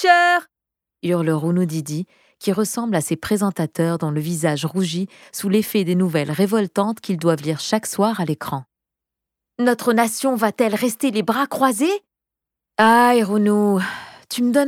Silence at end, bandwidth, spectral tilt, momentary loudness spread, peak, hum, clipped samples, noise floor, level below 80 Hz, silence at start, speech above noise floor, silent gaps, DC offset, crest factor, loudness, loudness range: 0 s; 17 kHz; -5 dB/octave; 11 LU; -2 dBFS; none; under 0.1%; -85 dBFS; -64 dBFS; 0 s; 66 dB; none; under 0.1%; 18 dB; -20 LUFS; 4 LU